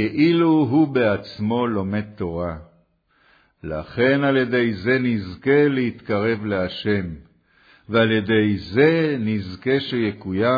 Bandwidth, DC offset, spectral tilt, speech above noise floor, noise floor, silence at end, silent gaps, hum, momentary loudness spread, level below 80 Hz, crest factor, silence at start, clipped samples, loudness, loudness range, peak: 5 kHz; under 0.1%; -9 dB/octave; 41 dB; -61 dBFS; 0 s; none; none; 11 LU; -50 dBFS; 16 dB; 0 s; under 0.1%; -20 LUFS; 3 LU; -4 dBFS